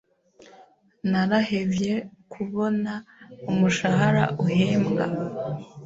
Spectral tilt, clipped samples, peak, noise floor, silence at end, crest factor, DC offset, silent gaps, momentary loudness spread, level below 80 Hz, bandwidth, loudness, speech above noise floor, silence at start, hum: -6.5 dB/octave; under 0.1%; -4 dBFS; -55 dBFS; 0 s; 20 dB; under 0.1%; none; 11 LU; -58 dBFS; 8 kHz; -24 LUFS; 31 dB; 0.6 s; none